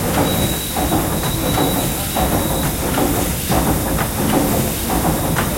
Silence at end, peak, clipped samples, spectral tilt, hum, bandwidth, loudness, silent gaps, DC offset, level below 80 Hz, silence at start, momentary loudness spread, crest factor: 0 s; -2 dBFS; under 0.1%; -4.5 dB/octave; none; 16.5 kHz; -18 LUFS; none; under 0.1%; -28 dBFS; 0 s; 2 LU; 16 dB